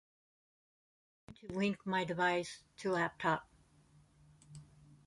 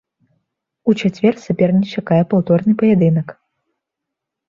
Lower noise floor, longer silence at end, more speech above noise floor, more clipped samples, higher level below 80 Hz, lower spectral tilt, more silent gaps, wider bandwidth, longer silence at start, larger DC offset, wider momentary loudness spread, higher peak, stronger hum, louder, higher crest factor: second, -67 dBFS vs -81 dBFS; second, 0.4 s vs 1.15 s; second, 30 dB vs 66 dB; neither; second, -72 dBFS vs -56 dBFS; second, -5.5 dB/octave vs -8.5 dB/octave; neither; first, 11.5 kHz vs 7.2 kHz; first, 1.3 s vs 0.85 s; neither; first, 23 LU vs 6 LU; second, -18 dBFS vs -2 dBFS; neither; second, -37 LUFS vs -16 LUFS; first, 22 dB vs 14 dB